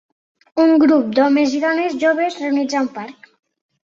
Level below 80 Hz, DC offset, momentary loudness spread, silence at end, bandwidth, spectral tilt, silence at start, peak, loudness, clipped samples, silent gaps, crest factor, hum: -64 dBFS; under 0.1%; 12 LU; 0.75 s; 7.6 kHz; -4.5 dB/octave; 0.55 s; -4 dBFS; -16 LUFS; under 0.1%; none; 14 dB; none